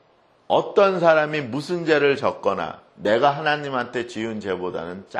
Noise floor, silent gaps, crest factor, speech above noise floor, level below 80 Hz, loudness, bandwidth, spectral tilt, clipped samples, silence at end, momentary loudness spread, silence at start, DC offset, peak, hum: -57 dBFS; none; 18 dB; 36 dB; -64 dBFS; -21 LUFS; 11 kHz; -5.5 dB/octave; under 0.1%; 0 s; 11 LU; 0.5 s; under 0.1%; -4 dBFS; none